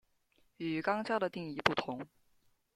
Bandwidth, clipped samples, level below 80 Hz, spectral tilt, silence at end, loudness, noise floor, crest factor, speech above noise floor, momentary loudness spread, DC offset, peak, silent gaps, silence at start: 14.5 kHz; under 0.1%; -68 dBFS; -5.5 dB/octave; 0.7 s; -35 LUFS; -72 dBFS; 28 dB; 37 dB; 11 LU; under 0.1%; -10 dBFS; none; 0.6 s